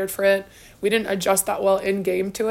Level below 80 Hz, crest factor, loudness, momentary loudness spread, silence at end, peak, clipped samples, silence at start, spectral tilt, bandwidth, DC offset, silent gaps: -54 dBFS; 16 dB; -22 LUFS; 4 LU; 0 s; -6 dBFS; under 0.1%; 0 s; -3.5 dB/octave; 16.5 kHz; under 0.1%; none